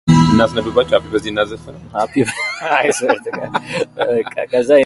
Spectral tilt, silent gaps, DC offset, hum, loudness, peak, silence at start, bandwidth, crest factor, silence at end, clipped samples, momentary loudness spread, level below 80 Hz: -5.5 dB/octave; none; under 0.1%; none; -17 LUFS; 0 dBFS; 0.05 s; 11.5 kHz; 16 dB; 0 s; under 0.1%; 10 LU; -42 dBFS